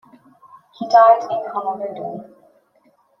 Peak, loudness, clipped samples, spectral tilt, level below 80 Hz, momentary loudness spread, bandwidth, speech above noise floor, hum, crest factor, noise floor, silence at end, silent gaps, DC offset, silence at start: -2 dBFS; -16 LUFS; under 0.1%; -5 dB/octave; -76 dBFS; 20 LU; 6.4 kHz; 42 dB; none; 18 dB; -59 dBFS; 0.95 s; none; under 0.1%; 0.8 s